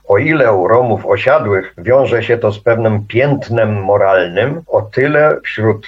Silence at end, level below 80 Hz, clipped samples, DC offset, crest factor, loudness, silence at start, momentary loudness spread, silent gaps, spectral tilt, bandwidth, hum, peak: 0 s; -50 dBFS; under 0.1%; under 0.1%; 12 dB; -13 LUFS; 0.1 s; 5 LU; none; -8.5 dB/octave; 7.4 kHz; none; 0 dBFS